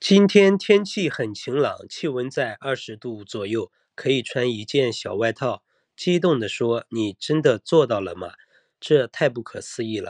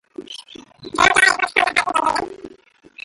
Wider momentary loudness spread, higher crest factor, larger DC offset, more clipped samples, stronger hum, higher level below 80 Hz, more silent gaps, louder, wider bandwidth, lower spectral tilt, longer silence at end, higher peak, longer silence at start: second, 15 LU vs 22 LU; about the same, 20 dB vs 20 dB; neither; neither; neither; second, -70 dBFS vs -50 dBFS; neither; second, -22 LUFS vs -16 LUFS; second, 10 kHz vs 12 kHz; first, -5.5 dB/octave vs -1 dB/octave; about the same, 0 s vs 0.05 s; about the same, -2 dBFS vs 0 dBFS; second, 0 s vs 0.2 s